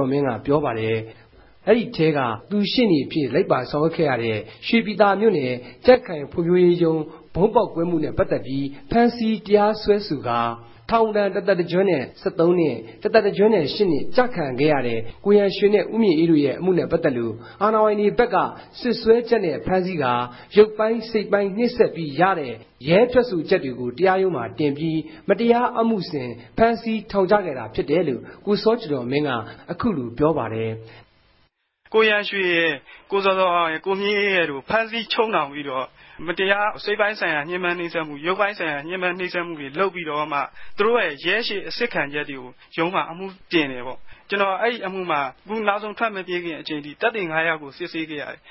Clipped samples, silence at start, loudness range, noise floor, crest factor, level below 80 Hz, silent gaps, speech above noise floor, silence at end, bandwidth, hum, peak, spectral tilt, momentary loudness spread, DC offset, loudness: under 0.1%; 0 s; 5 LU; -64 dBFS; 18 dB; -52 dBFS; none; 43 dB; 0.15 s; 5.8 kHz; none; -2 dBFS; -10.5 dB/octave; 10 LU; under 0.1%; -21 LUFS